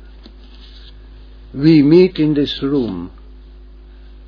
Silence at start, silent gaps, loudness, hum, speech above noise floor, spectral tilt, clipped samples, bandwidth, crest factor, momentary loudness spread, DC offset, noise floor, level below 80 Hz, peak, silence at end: 0.6 s; none; -14 LUFS; none; 25 dB; -9 dB/octave; under 0.1%; 5.4 kHz; 16 dB; 20 LU; under 0.1%; -38 dBFS; -38 dBFS; 0 dBFS; 1.2 s